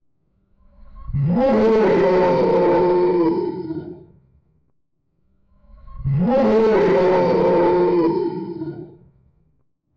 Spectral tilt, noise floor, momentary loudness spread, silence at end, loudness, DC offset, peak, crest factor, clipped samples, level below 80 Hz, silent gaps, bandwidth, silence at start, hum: -9 dB/octave; -69 dBFS; 14 LU; 1.05 s; -17 LUFS; under 0.1%; -8 dBFS; 10 dB; under 0.1%; -44 dBFS; none; 6.8 kHz; 0.9 s; none